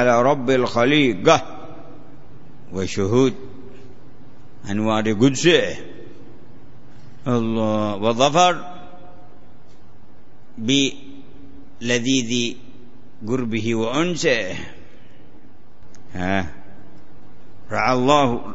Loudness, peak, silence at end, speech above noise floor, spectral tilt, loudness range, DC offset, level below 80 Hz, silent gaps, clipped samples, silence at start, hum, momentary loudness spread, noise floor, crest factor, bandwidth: -19 LUFS; 0 dBFS; 0 s; 32 dB; -4.5 dB/octave; 6 LU; 3%; -52 dBFS; none; under 0.1%; 0 s; none; 22 LU; -50 dBFS; 22 dB; 8 kHz